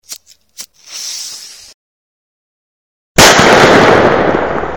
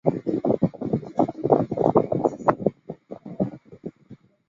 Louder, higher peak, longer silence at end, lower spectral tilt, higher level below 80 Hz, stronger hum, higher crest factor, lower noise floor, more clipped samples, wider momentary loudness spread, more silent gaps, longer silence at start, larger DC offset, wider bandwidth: first, -7 LUFS vs -24 LUFS; about the same, 0 dBFS vs 0 dBFS; second, 0 s vs 0.35 s; second, -3 dB/octave vs -10 dB/octave; first, -34 dBFS vs -56 dBFS; neither; second, 12 dB vs 24 dB; second, -34 dBFS vs -50 dBFS; first, 1% vs under 0.1%; first, 23 LU vs 19 LU; first, 1.74-3.15 s vs none; about the same, 0.1 s vs 0.05 s; neither; first, over 20 kHz vs 7.4 kHz